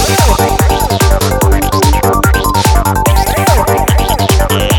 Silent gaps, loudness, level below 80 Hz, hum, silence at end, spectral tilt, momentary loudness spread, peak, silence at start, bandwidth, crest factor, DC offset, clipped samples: none; -10 LUFS; -14 dBFS; none; 0 s; -4.5 dB/octave; 1 LU; 0 dBFS; 0 s; 19 kHz; 10 dB; under 0.1%; under 0.1%